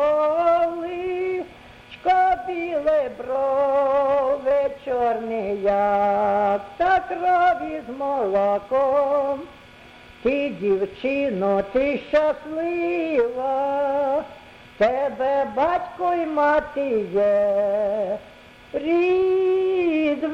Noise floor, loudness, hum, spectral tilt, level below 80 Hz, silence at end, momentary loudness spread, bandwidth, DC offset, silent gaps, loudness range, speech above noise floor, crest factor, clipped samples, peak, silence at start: -46 dBFS; -22 LUFS; none; -7 dB/octave; -54 dBFS; 0 s; 8 LU; 7.6 kHz; under 0.1%; none; 2 LU; 24 dB; 14 dB; under 0.1%; -8 dBFS; 0 s